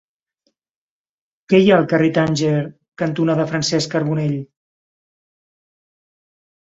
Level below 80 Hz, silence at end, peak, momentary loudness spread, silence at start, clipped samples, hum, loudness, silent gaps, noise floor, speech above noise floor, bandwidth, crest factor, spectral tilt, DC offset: -58 dBFS; 2.3 s; -2 dBFS; 10 LU; 1.5 s; under 0.1%; none; -18 LUFS; 2.88-2.92 s; -70 dBFS; 53 dB; 7.8 kHz; 20 dB; -6 dB/octave; under 0.1%